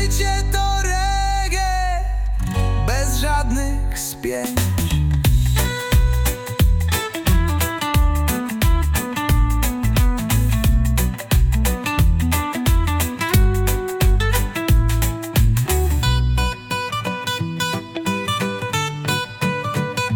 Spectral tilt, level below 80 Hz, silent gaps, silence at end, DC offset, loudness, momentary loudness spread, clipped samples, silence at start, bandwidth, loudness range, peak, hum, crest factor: -4.5 dB/octave; -20 dBFS; none; 0 s; under 0.1%; -20 LUFS; 5 LU; under 0.1%; 0 s; 19 kHz; 3 LU; -4 dBFS; none; 14 dB